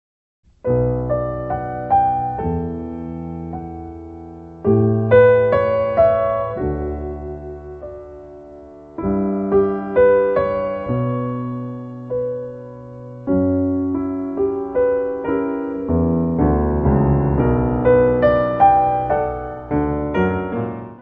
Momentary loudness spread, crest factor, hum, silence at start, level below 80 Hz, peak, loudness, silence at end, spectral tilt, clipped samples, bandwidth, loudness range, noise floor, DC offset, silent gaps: 19 LU; 18 dB; none; 0.65 s; -34 dBFS; -2 dBFS; -19 LUFS; 0 s; -11 dB/octave; under 0.1%; 4.5 kHz; 7 LU; -39 dBFS; under 0.1%; none